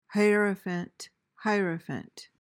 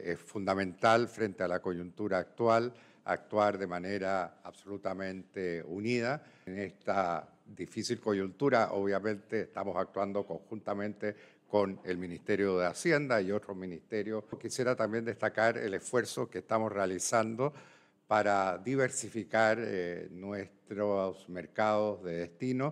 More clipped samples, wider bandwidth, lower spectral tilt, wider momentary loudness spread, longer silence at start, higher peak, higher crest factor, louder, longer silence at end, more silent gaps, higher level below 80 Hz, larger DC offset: neither; first, 16 kHz vs 14.5 kHz; about the same, -6 dB/octave vs -5 dB/octave; first, 22 LU vs 12 LU; about the same, 0.1 s vs 0 s; about the same, -14 dBFS vs -12 dBFS; about the same, 16 dB vs 20 dB; first, -29 LUFS vs -33 LUFS; first, 0.2 s vs 0 s; neither; about the same, -76 dBFS vs -74 dBFS; neither